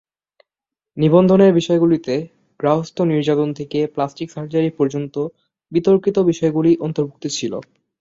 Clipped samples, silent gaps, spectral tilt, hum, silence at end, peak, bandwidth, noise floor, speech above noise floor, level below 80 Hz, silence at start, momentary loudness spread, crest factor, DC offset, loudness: under 0.1%; none; -7 dB/octave; none; 0.4 s; -2 dBFS; 7.8 kHz; -87 dBFS; 70 dB; -58 dBFS; 0.95 s; 12 LU; 16 dB; under 0.1%; -18 LUFS